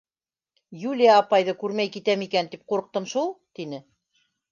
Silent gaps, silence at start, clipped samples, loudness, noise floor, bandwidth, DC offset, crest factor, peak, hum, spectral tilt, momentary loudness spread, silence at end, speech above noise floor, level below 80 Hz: none; 0.7 s; under 0.1%; -23 LUFS; under -90 dBFS; 7.4 kHz; under 0.1%; 20 dB; -4 dBFS; none; -4.5 dB/octave; 18 LU; 0.7 s; over 67 dB; -78 dBFS